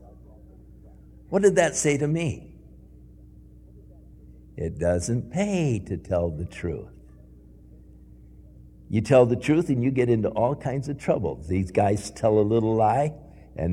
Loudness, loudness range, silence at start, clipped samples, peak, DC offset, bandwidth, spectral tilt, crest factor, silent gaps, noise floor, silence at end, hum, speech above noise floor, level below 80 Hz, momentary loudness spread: -24 LUFS; 8 LU; 0.85 s; under 0.1%; -6 dBFS; under 0.1%; 14 kHz; -6.5 dB/octave; 20 dB; none; -49 dBFS; 0 s; none; 26 dB; -46 dBFS; 12 LU